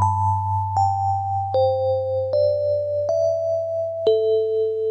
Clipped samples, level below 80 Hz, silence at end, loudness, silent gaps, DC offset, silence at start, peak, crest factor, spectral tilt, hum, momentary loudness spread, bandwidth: under 0.1%; -62 dBFS; 0 s; -21 LUFS; none; under 0.1%; 0 s; -8 dBFS; 12 dB; -7.5 dB/octave; none; 3 LU; 8.4 kHz